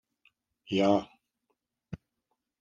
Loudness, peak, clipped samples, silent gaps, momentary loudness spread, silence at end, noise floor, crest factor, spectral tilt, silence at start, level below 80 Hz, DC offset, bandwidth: -28 LUFS; -10 dBFS; under 0.1%; none; 21 LU; 0.65 s; -82 dBFS; 24 dB; -6.5 dB/octave; 0.7 s; -70 dBFS; under 0.1%; 7.6 kHz